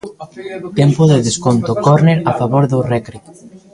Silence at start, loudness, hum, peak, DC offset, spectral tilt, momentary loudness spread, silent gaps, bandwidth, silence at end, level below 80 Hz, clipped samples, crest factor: 0.05 s; -13 LUFS; none; 0 dBFS; under 0.1%; -6.5 dB/octave; 17 LU; none; 11 kHz; 0.15 s; -46 dBFS; under 0.1%; 14 dB